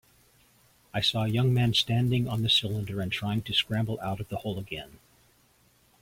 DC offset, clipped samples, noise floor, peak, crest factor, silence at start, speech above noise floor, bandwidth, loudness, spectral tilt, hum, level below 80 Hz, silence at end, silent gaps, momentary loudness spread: under 0.1%; under 0.1%; -64 dBFS; -12 dBFS; 18 dB; 0.95 s; 36 dB; 16.5 kHz; -27 LUFS; -5.5 dB/octave; none; -56 dBFS; 1.1 s; none; 12 LU